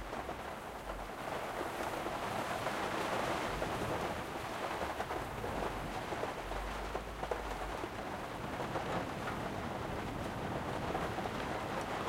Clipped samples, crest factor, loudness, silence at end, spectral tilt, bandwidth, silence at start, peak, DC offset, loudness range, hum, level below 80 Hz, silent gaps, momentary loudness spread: under 0.1%; 18 dB; -39 LUFS; 0 s; -5 dB/octave; 16 kHz; 0 s; -22 dBFS; under 0.1%; 3 LU; none; -52 dBFS; none; 5 LU